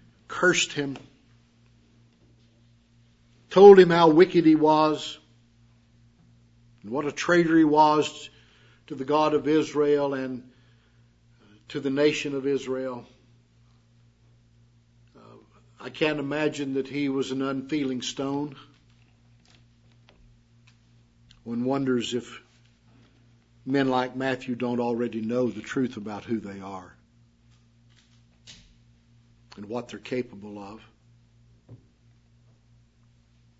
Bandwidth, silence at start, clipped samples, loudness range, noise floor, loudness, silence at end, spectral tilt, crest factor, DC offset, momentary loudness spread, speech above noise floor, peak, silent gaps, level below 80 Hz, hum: 8 kHz; 0.3 s; under 0.1%; 20 LU; -60 dBFS; -23 LUFS; 1.85 s; -5.5 dB/octave; 24 dB; under 0.1%; 22 LU; 38 dB; -2 dBFS; none; -66 dBFS; none